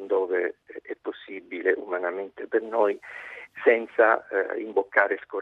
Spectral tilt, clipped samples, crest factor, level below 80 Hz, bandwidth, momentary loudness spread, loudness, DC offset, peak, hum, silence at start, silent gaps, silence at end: -6 dB/octave; under 0.1%; 22 dB; -78 dBFS; 4.4 kHz; 18 LU; -25 LUFS; under 0.1%; -4 dBFS; none; 0 s; none; 0 s